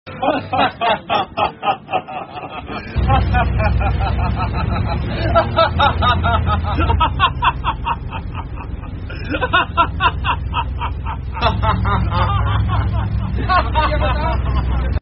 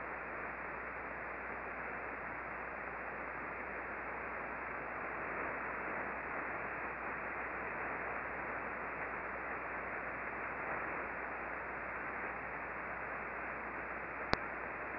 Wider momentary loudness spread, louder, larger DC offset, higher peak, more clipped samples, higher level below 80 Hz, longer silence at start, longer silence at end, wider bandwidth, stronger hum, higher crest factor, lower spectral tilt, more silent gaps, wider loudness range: first, 12 LU vs 3 LU; first, -18 LUFS vs -41 LUFS; neither; first, -2 dBFS vs -10 dBFS; neither; first, -24 dBFS vs -62 dBFS; about the same, 0.05 s vs 0 s; about the same, 0 s vs 0 s; about the same, 5.8 kHz vs 5.6 kHz; neither; second, 16 dB vs 32 dB; first, -4.5 dB/octave vs -3 dB/octave; neither; about the same, 3 LU vs 2 LU